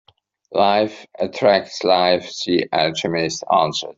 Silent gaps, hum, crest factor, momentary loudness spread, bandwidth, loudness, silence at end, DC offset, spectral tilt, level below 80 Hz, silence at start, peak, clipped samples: none; none; 16 dB; 8 LU; 7.8 kHz; -19 LUFS; 0.05 s; under 0.1%; -4 dB/octave; -60 dBFS; 0.5 s; -2 dBFS; under 0.1%